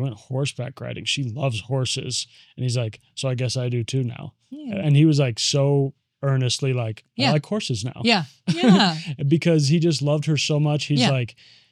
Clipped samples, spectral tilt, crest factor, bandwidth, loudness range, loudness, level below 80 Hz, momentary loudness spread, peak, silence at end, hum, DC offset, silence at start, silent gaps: under 0.1%; -5.5 dB/octave; 18 dB; 11 kHz; 6 LU; -22 LUFS; -64 dBFS; 12 LU; -2 dBFS; 0.4 s; none; under 0.1%; 0 s; none